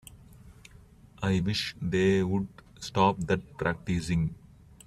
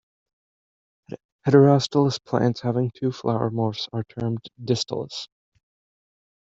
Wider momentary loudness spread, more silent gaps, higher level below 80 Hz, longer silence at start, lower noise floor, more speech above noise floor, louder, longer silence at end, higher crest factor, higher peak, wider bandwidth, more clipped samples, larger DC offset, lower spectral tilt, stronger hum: second, 9 LU vs 18 LU; second, none vs 1.25-1.39 s; first, -50 dBFS vs -62 dBFS; second, 0.45 s vs 1.1 s; second, -54 dBFS vs under -90 dBFS; second, 26 dB vs over 68 dB; second, -29 LUFS vs -23 LUFS; second, 0.5 s vs 1.3 s; about the same, 20 dB vs 22 dB; second, -10 dBFS vs -4 dBFS; first, 13.5 kHz vs 8 kHz; neither; neither; about the same, -6 dB/octave vs -6.5 dB/octave; neither